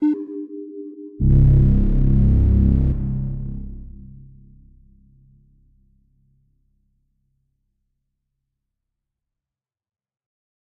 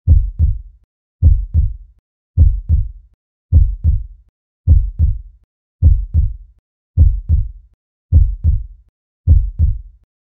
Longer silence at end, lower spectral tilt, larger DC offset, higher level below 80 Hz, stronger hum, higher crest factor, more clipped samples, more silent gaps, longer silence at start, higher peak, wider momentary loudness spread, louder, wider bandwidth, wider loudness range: first, 6.75 s vs 0.5 s; about the same, -12.5 dB/octave vs -13.5 dB/octave; neither; second, -24 dBFS vs -16 dBFS; neither; about the same, 16 dB vs 14 dB; neither; second, none vs 0.84-1.19 s, 1.99-2.34 s, 3.14-3.49 s, 4.29-4.64 s, 5.44-5.79 s, 6.59-6.94 s, 7.74-8.09 s, 8.89-9.24 s; about the same, 0 s vs 0.05 s; second, -6 dBFS vs 0 dBFS; first, 21 LU vs 16 LU; about the same, -19 LUFS vs -17 LUFS; first, 2.3 kHz vs 0.8 kHz; first, 17 LU vs 2 LU